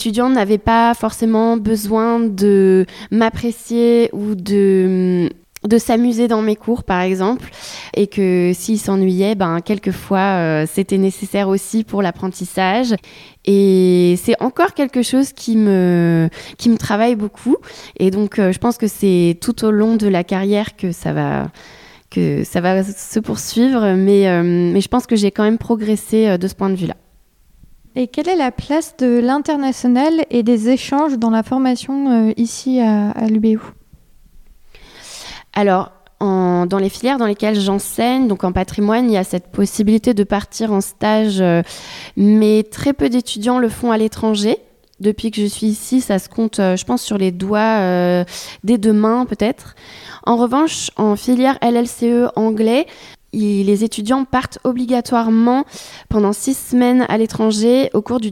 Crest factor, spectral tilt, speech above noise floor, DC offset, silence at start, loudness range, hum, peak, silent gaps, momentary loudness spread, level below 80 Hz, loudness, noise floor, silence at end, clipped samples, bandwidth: 16 dB; -6 dB/octave; 36 dB; under 0.1%; 0 s; 3 LU; none; 0 dBFS; none; 7 LU; -44 dBFS; -16 LUFS; -52 dBFS; 0 s; under 0.1%; 16 kHz